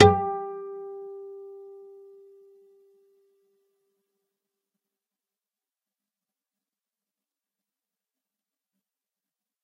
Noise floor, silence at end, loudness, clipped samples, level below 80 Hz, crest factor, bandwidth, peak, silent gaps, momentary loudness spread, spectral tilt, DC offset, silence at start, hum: under -90 dBFS; 7.9 s; -28 LUFS; under 0.1%; -62 dBFS; 30 dB; 9.2 kHz; 0 dBFS; none; 22 LU; -6 dB/octave; under 0.1%; 0 s; none